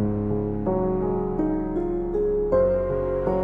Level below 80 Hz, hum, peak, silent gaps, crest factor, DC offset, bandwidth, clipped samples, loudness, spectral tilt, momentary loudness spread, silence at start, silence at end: -36 dBFS; none; -8 dBFS; none; 16 dB; under 0.1%; 4.8 kHz; under 0.1%; -24 LUFS; -11.5 dB/octave; 5 LU; 0 s; 0 s